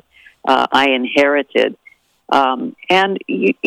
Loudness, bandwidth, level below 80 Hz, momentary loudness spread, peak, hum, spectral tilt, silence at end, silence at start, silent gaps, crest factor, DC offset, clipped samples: -15 LUFS; 15 kHz; -60 dBFS; 5 LU; -2 dBFS; none; -4.5 dB/octave; 0 s; 0.45 s; none; 14 dB; under 0.1%; under 0.1%